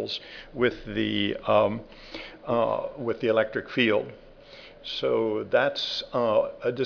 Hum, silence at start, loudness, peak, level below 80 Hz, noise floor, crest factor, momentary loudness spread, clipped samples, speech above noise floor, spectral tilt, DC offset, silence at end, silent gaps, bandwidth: none; 0 s; -26 LUFS; -8 dBFS; -54 dBFS; -48 dBFS; 18 dB; 16 LU; under 0.1%; 21 dB; -6 dB/octave; under 0.1%; 0 s; none; 5.4 kHz